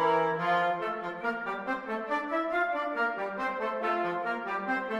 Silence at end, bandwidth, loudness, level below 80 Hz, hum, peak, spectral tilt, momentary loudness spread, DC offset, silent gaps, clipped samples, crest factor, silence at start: 0 s; 12 kHz; -31 LUFS; -70 dBFS; none; -14 dBFS; -6 dB/octave; 6 LU; under 0.1%; none; under 0.1%; 16 dB; 0 s